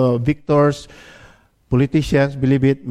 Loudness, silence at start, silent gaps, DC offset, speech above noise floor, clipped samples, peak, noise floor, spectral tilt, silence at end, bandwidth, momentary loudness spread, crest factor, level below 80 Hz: -17 LUFS; 0 s; none; under 0.1%; 32 dB; under 0.1%; -2 dBFS; -49 dBFS; -8 dB/octave; 0 s; 11.5 kHz; 4 LU; 14 dB; -40 dBFS